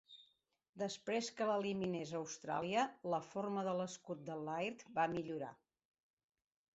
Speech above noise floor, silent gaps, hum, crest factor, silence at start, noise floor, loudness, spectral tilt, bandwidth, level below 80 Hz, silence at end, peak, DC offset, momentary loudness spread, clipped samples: 39 dB; 0.69-0.73 s; none; 18 dB; 0.1 s; -80 dBFS; -41 LUFS; -4 dB/octave; 8 kHz; -80 dBFS; 1.2 s; -24 dBFS; under 0.1%; 9 LU; under 0.1%